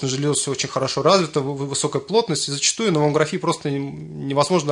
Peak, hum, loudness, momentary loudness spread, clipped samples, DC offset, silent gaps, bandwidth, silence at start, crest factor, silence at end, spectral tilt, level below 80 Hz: -4 dBFS; none; -20 LUFS; 7 LU; under 0.1%; under 0.1%; none; 11 kHz; 0 s; 18 dB; 0 s; -4 dB/octave; -60 dBFS